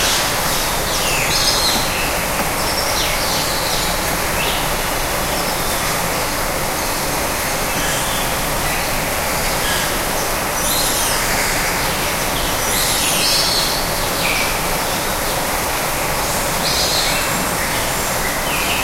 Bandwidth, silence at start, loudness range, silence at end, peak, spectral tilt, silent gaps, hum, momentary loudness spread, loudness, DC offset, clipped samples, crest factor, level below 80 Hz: 16 kHz; 0 s; 2 LU; 0 s; -2 dBFS; -2 dB/octave; none; none; 4 LU; -17 LUFS; under 0.1%; under 0.1%; 16 dB; -30 dBFS